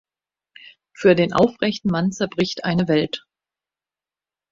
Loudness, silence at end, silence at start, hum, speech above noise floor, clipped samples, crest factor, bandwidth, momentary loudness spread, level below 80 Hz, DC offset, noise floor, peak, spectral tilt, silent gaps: -20 LUFS; 1.35 s; 1 s; none; over 71 dB; under 0.1%; 20 dB; 7.6 kHz; 6 LU; -56 dBFS; under 0.1%; under -90 dBFS; -2 dBFS; -6 dB/octave; none